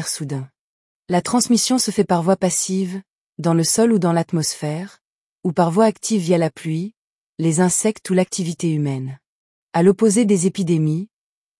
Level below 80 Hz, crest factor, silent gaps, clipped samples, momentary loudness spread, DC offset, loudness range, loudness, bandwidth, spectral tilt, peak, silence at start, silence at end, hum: -64 dBFS; 16 dB; 0.59-1.03 s, 3.10-3.33 s, 5.01-5.39 s, 6.97-7.33 s, 9.26-9.67 s; under 0.1%; 12 LU; under 0.1%; 3 LU; -19 LUFS; 12 kHz; -5 dB/octave; -4 dBFS; 0 s; 0.55 s; none